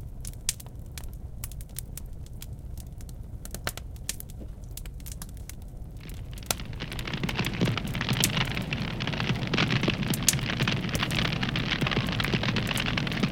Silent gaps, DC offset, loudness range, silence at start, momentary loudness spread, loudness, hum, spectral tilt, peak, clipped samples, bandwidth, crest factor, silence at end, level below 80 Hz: none; under 0.1%; 12 LU; 0 s; 17 LU; -29 LUFS; none; -3.5 dB/octave; 0 dBFS; under 0.1%; 17 kHz; 30 dB; 0 s; -40 dBFS